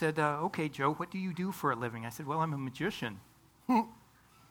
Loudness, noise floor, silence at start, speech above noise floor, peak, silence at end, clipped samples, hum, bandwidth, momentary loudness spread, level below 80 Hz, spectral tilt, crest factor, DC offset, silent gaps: -34 LUFS; -62 dBFS; 0 s; 28 dB; -14 dBFS; 0.55 s; under 0.1%; none; 19 kHz; 10 LU; -70 dBFS; -6 dB/octave; 20 dB; under 0.1%; none